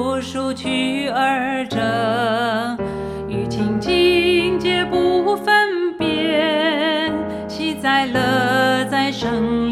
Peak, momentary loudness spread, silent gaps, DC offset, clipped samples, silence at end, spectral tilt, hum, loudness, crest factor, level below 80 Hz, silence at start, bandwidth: -4 dBFS; 9 LU; none; under 0.1%; under 0.1%; 0 s; -5 dB/octave; none; -18 LUFS; 14 dB; -46 dBFS; 0 s; 14 kHz